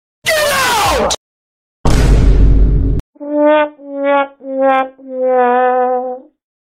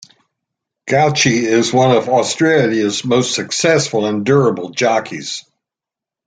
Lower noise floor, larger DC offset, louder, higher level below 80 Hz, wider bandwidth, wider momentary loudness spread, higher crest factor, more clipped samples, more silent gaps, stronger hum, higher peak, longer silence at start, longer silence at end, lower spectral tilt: about the same, under -90 dBFS vs -87 dBFS; neither; about the same, -14 LUFS vs -14 LUFS; first, -16 dBFS vs -56 dBFS; first, 16 kHz vs 9.6 kHz; about the same, 9 LU vs 8 LU; about the same, 12 dB vs 14 dB; neither; first, 1.17-1.84 s, 3.00-3.13 s vs none; neither; about the same, 0 dBFS vs 0 dBFS; second, 0.25 s vs 0.85 s; second, 0.4 s vs 0.85 s; about the same, -5 dB/octave vs -4 dB/octave